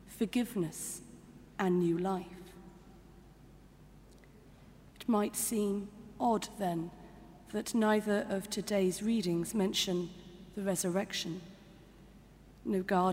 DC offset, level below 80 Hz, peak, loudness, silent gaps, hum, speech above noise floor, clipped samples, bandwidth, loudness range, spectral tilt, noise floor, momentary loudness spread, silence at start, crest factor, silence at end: under 0.1%; -62 dBFS; -16 dBFS; -34 LUFS; none; none; 24 dB; under 0.1%; 16 kHz; 5 LU; -4.5 dB/octave; -57 dBFS; 21 LU; 0.05 s; 18 dB; 0 s